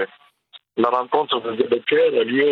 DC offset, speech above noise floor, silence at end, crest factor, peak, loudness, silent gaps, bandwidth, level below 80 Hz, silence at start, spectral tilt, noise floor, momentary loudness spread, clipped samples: under 0.1%; 31 dB; 0 s; 18 dB; -2 dBFS; -20 LUFS; none; 4.7 kHz; -74 dBFS; 0 s; -7 dB/octave; -50 dBFS; 7 LU; under 0.1%